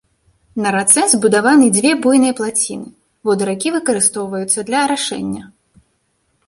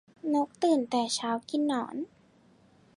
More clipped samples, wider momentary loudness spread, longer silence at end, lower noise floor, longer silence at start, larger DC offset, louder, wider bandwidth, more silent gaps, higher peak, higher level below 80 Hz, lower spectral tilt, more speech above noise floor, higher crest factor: neither; about the same, 13 LU vs 11 LU; about the same, 1 s vs 0.9 s; about the same, -64 dBFS vs -61 dBFS; first, 0.55 s vs 0.25 s; neither; first, -14 LUFS vs -29 LUFS; about the same, 12.5 kHz vs 11.5 kHz; neither; first, 0 dBFS vs -14 dBFS; first, -56 dBFS vs -78 dBFS; about the same, -3 dB/octave vs -3.5 dB/octave; first, 50 dB vs 33 dB; about the same, 16 dB vs 16 dB